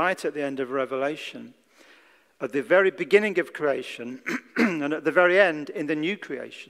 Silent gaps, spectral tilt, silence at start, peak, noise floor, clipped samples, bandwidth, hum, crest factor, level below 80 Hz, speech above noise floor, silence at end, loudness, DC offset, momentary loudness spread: none; -5 dB/octave; 0 s; -4 dBFS; -57 dBFS; under 0.1%; 14.5 kHz; none; 22 dB; -78 dBFS; 32 dB; 0.05 s; -24 LUFS; under 0.1%; 14 LU